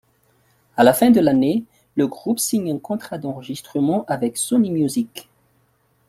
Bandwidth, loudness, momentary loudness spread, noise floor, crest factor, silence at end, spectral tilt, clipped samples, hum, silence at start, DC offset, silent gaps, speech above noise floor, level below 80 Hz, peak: 16 kHz; -20 LUFS; 15 LU; -62 dBFS; 18 dB; 0.85 s; -5 dB/octave; under 0.1%; none; 0.75 s; under 0.1%; none; 44 dB; -60 dBFS; -2 dBFS